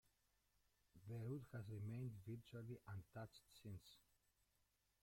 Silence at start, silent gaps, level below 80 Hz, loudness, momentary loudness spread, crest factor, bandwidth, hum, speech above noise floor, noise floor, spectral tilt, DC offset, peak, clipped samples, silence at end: 0.95 s; none; -78 dBFS; -55 LUFS; 9 LU; 16 dB; 16.5 kHz; none; 31 dB; -85 dBFS; -7.5 dB/octave; under 0.1%; -40 dBFS; under 0.1%; 1 s